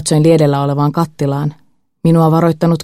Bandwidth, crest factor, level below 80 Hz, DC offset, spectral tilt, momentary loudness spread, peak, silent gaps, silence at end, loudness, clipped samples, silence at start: 13.5 kHz; 12 dB; -50 dBFS; under 0.1%; -7 dB/octave; 8 LU; 0 dBFS; none; 0 s; -13 LUFS; under 0.1%; 0 s